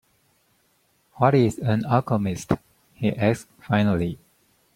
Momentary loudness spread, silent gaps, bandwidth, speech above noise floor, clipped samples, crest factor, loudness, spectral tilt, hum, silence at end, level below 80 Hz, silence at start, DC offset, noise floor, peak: 8 LU; none; 15.5 kHz; 44 dB; under 0.1%; 22 dB; -23 LUFS; -7.5 dB/octave; none; 0.6 s; -54 dBFS; 1.15 s; under 0.1%; -66 dBFS; -2 dBFS